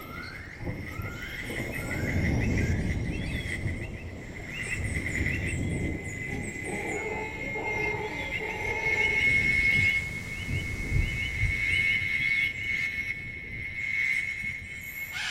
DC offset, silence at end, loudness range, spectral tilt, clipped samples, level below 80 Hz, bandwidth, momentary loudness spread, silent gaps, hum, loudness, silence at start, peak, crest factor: under 0.1%; 0 s; 7 LU; -5 dB/octave; under 0.1%; -40 dBFS; 16 kHz; 14 LU; none; none; -28 LUFS; 0 s; -14 dBFS; 16 dB